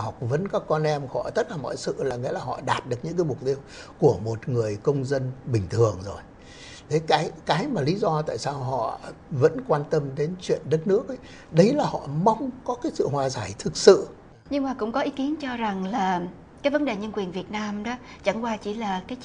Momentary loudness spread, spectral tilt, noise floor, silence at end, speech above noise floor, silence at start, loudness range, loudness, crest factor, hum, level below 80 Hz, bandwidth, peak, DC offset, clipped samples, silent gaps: 9 LU; -6 dB/octave; -44 dBFS; 0 s; 19 dB; 0 s; 4 LU; -25 LUFS; 24 dB; none; -54 dBFS; 10.5 kHz; 0 dBFS; under 0.1%; under 0.1%; none